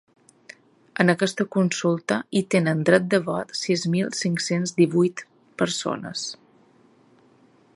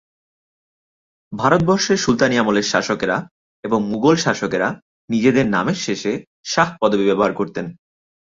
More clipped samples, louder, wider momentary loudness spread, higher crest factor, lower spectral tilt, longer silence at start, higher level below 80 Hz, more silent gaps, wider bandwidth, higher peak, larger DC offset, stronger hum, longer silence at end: neither; second, -23 LUFS vs -18 LUFS; about the same, 11 LU vs 9 LU; about the same, 22 dB vs 18 dB; about the same, -5 dB/octave vs -4.5 dB/octave; second, 0.95 s vs 1.3 s; second, -68 dBFS vs -52 dBFS; second, none vs 3.31-3.63 s, 4.82-5.08 s, 6.27-6.43 s; first, 11.5 kHz vs 7.8 kHz; about the same, -2 dBFS vs -2 dBFS; neither; neither; first, 1.4 s vs 0.55 s